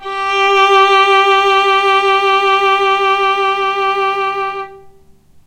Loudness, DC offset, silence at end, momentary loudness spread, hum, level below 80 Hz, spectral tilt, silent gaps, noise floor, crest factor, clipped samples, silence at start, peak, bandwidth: -11 LUFS; under 0.1%; 0.55 s; 8 LU; none; -52 dBFS; -1.5 dB/octave; none; -44 dBFS; 12 dB; under 0.1%; 0 s; 0 dBFS; 15 kHz